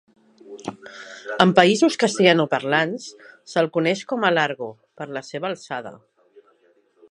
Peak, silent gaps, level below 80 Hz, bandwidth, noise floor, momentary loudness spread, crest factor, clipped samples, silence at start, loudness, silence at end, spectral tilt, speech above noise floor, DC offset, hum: 0 dBFS; none; -68 dBFS; 11 kHz; -60 dBFS; 20 LU; 22 dB; under 0.1%; 0.45 s; -20 LUFS; 1.15 s; -4.5 dB/octave; 39 dB; under 0.1%; none